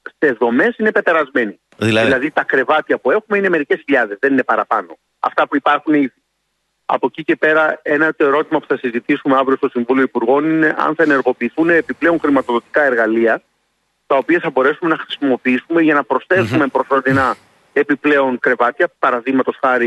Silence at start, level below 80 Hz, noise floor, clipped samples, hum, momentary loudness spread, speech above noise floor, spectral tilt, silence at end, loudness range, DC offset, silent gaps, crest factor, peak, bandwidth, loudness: 0.05 s; -58 dBFS; -69 dBFS; under 0.1%; none; 5 LU; 54 dB; -6.5 dB/octave; 0 s; 2 LU; under 0.1%; none; 14 dB; -2 dBFS; 11.5 kHz; -15 LUFS